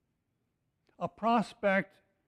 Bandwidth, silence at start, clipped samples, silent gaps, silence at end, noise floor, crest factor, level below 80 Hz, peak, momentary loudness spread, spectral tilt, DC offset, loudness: 11 kHz; 1 s; under 0.1%; none; 0.45 s; -80 dBFS; 18 dB; -72 dBFS; -16 dBFS; 11 LU; -6.5 dB/octave; under 0.1%; -31 LUFS